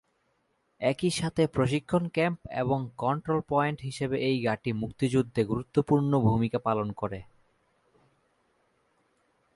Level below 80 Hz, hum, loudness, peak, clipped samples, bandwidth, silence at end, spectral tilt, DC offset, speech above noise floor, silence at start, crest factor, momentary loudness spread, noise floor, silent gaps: -56 dBFS; none; -28 LUFS; -12 dBFS; under 0.1%; 11.5 kHz; 2.3 s; -6.5 dB/octave; under 0.1%; 46 dB; 0.8 s; 18 dB; 7 LU; -73 dBFS; none